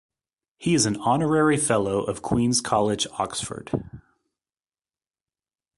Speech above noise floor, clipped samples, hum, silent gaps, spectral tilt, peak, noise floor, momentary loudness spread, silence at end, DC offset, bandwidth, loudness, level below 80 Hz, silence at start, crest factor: over 67 dB; under 0.1%; none; none; -4.5 dB/octave; -6 dBFS; under -90 dBFS; 11 LU; 1.75 s; under 0.1%; 11.5 kHz; -23 LUFS; -52 dBFS; 0.6 s; 20 dB